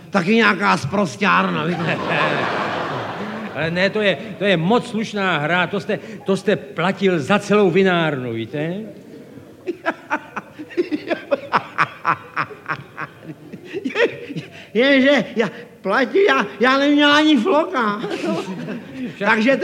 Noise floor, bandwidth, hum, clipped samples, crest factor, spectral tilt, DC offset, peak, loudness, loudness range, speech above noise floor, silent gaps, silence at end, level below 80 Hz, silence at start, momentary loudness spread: -40 dBFS; 15 kHz; none; under 0.1%; 18 dB; -5.5 dB/octave; under 0.1%; -2 dBFS; -19 LUFS; 7 LU; 22 dB; none; 0 s; -64 dBFS; 0 s; 15 LU